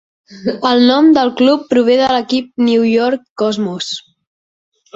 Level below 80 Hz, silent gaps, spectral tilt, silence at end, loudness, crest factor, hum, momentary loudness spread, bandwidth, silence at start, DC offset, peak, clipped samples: -56 dBFS; 3.30-3.36 s; -5 dB/octave; 0.95 s; -13 LUFS; 12 dB; none; 12 LU; 7.8 kHz; 0.3 s; under 0.1%; -2 dBFS; under 0.1%